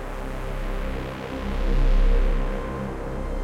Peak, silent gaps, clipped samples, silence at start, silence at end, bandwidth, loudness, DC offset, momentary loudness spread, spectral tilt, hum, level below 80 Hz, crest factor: -10 dBFS; none; under 0.1%; 0 s; 0 s; 6.8 kHz; -28 LUFS; under 0.1%; 9 LU; -7 dB/octave; none; -24 dBFS; 12 dB